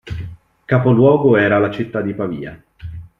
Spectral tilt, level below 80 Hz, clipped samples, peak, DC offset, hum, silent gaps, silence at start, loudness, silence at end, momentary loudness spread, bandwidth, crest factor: -9.5 dB/octave; -44 dBFS; under 0.1%; -2 dBFS; under 0.1%; none; none; 0.05 s; -15 LUFS; 0.15 s; 22 LU; 5.2 kHz; 16 dB